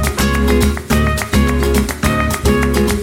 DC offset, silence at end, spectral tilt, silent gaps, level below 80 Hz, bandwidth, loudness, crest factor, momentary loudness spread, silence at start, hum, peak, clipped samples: under 0.1%; 0 s; -5 dB/octave; none; -20 dBFS; 17 kHz; -15 LUFS; 12 dB; 2 LU; 0 s; none; 0 dBFS; under 0.1%